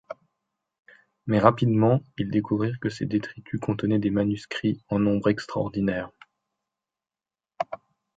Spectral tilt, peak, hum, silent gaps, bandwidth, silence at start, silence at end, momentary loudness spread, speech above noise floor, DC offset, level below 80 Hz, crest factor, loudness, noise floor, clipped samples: -8 dB/octave; 0 dBFS; none; 0.79-0.84 s; 7.8 kHz; 0.1 s; 0.4 s; 13 LU; over 66 dB; under 0.1%; -56 dBFS; 26 dB; -25 LUFS; under -90 dBFS; under 0.1%